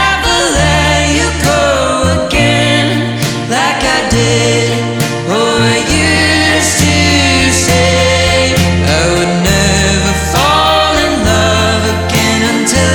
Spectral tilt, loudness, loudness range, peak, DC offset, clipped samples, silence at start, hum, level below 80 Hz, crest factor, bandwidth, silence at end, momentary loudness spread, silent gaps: -4 dB/octave; -10 LUFS; 2 LU; 0 dBFS; under 0.1%; under 0.1%; 0 s; none; -24 dBFS; 10 dB; 19 kHz; 0 s; 4 LU; none